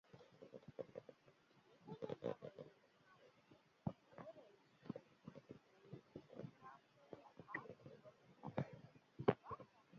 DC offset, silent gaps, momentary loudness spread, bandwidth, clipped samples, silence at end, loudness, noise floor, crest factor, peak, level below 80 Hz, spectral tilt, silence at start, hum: under 0.1%; none; 17 LU; 7 kHz; under 0.1%; 0 s; -52 LUFS; -73 dBFS; 34 dB; -20 dBFS; -80 dBFS; -6.5 dB/octave; 0.1 s; none